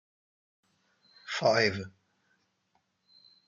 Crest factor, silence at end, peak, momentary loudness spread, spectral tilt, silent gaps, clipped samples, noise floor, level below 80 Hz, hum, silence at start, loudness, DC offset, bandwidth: 24 dB; 1.6 s; -12 dBFS; 23 LU; -4 dB/octave; none; under 0.1%; -76 dBFS; -76 dBFS; none; 1.25 s; -28 LUFS; under 0.1%; 7.6 kHz